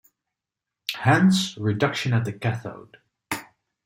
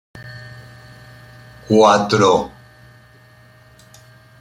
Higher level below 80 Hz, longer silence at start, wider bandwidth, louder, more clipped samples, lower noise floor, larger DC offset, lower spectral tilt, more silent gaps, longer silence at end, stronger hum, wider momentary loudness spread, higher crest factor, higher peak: second, -62 dBFS vs -54 dBFS; first, 0.9 s vs 0.15 s; first, 16.5 kHz vs 13.5 kHz; second, -24 LUFS vs -14 LUFS; neither; first, -87 dBFS vs -47 dBFS; neither; about the same, -5.5 dB/octave vs -5 dB/octave; neither; second, 0.45 s vs 1.95 s; neither; second, 15 LU vs 25 LU; about the same, 20 dB vs 18 dB; second, -6 dBFS vs -2 dBFS